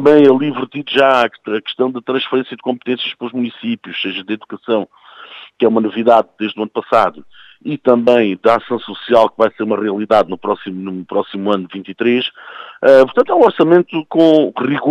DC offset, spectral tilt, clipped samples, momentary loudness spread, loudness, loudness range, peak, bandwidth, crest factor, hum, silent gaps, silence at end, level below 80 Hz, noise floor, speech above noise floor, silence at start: under 0.1%; -7 dB/octave; under 0.1%; 13 LU; -15 LUFS; 7 LU; 0 dBFS; 9 kHz; 14 dB; none; none; 0 s; -60 dBFS; -37 dBFS; 23 dB; 0 s